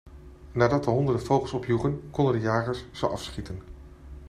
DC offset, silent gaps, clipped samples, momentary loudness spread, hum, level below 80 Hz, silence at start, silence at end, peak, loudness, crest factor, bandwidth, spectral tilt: under 0.1%; none; under 0.1%; 13 LU; none; -46 dBFS; 0.05 s; 0 s; -8 dBFS; -27 LUFS; 20 dB; 13 kHz; -7 dB/octave